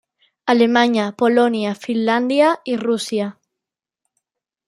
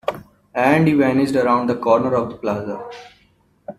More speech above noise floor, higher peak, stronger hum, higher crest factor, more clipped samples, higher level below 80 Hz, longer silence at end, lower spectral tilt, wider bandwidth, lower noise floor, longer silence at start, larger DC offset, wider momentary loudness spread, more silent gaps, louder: first, 69 dB vs 41 dB; about the same, -2 dBFS vs -2 dBFS; neither; about the same, 18 dB vs 18 dB; neither; second, -70 dBFS vs -56 dBFS; first, 1.35 s vs 0.05 s; second, -5 dB/octave vs -7.5 dB/octave; second, 12.5 kHz vs 14 kHz; first, -85 dBFS vs -58 dBFS; first, 0.45 s vs 0.05 s; neither; second, 8 LU vs 17 LU; neither; about the same, -18 LUFS vs -18 LUFS